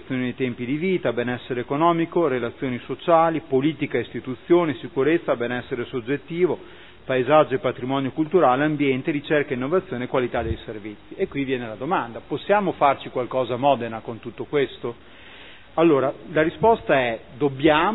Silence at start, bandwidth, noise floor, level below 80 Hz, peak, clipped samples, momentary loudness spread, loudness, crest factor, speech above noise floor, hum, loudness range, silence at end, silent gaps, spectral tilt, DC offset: 0.05 s; 4.1 kHz; -45 dBFS; -50 dBFS; -4 dBFS; under 0.1%; 13 LU; -23 LUFS; 20 dB; 23 dB; none; 3 LU; 0 s; none; -10.5 dB/octave; 0.4%